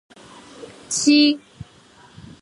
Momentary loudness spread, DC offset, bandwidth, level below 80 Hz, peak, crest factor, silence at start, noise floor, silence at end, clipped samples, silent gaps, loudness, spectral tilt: 26 LU; under 0.1%; 11.5 kHz; -58 dBFS; -4 dBFS; 18 dB; 0.6 s; -50 dBFS; 0.8 s; under 0.1%; none; -17 LUFS; -2 dB/octave